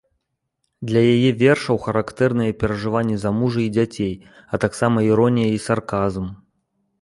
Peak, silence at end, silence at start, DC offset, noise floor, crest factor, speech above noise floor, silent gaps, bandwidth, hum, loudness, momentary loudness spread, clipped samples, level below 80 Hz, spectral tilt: -4 dBFS; 0.65 s; 0.8 s; under 0.1%; -75 dBFS; 16 dB; 56 dB; none; 11.5 kHz; none; -20 LUFS; 10 LU; under 0.1%; -46 dBFS; -7 dB/octave